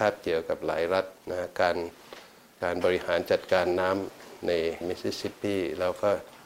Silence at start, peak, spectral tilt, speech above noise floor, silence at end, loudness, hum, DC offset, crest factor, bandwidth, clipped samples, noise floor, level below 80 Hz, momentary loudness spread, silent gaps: 0 s; -8 dBFS; -5 dB/octave; 21 dB; 0 s; -29 LUFS; none; under 0.1%; 20 dB; 16 kHz; under 0.1%; -49 dBFS; -60 dBFS; 9 LU; none